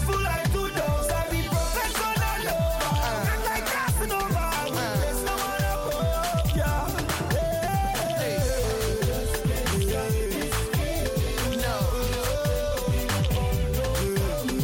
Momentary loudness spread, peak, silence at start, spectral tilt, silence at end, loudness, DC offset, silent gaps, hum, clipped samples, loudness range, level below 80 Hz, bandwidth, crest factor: 2 LU; -14 dBFS; 0 s; -4.5 dB/octave; 0 s; -26 LUFS; under 0.1%; none; none; under 0.1%; 1 LU; -32 dBFS; 17 kHz; 12 dB